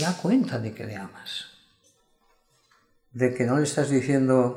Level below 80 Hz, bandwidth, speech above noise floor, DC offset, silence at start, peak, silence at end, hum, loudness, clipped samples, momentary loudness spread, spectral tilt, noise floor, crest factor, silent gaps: -68 dBFS; 14.5 kHz; 41 dB; under 0.1%; 0 s; -8 dBFS; 0 s; none; -25 LUFS; under 0.1%; 15 LU; -6 dB/octave; -65 dBFS; 18 dB; none